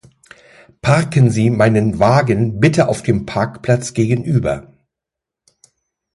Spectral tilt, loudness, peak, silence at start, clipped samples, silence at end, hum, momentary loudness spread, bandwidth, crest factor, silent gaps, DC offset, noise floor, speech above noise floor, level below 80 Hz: -7 dB/octave; -15 LUFS; 0 dBFS; 0.85 s; under 0.1%; 1.55 s; none; 7 LU; 11.5 kHz; 16 dB; none; under 0.1%; -84 dBFS; 70 dB; -42 dBFS